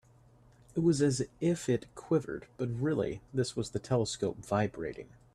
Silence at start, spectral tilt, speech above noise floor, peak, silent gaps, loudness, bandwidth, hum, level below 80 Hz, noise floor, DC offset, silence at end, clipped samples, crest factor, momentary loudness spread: 0.75 s; -6 dB/octave; 29 dB; -16 dBFS; none; -33 LUFS; 13 kHz; none; -60 dBFS; -61 dBFS; under 0.1%; 0.3 s; under 0.1%; 18 dB; 9 LU